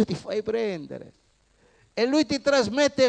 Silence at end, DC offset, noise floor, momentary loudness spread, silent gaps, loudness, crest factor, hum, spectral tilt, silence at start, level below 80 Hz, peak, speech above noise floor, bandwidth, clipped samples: 0 s; under 0.1%; -62 dBFS; 14 LU; none; -25 LUFS; 16 dB; none; -4.5 dB/octave; 0 s; -60 dBFS; -8 dBFS; 39 dB; 9.8 kHz; under 0.1%